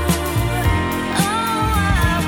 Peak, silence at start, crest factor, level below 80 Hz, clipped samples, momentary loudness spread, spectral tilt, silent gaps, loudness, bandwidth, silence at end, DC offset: -4 dBFS; 0 s; 14 dB; -26 dBFS; under 0.1%; 3 LU; -5 dB/octave; none; -18 LUFS; 19 kHz; 0 s; under 0.1%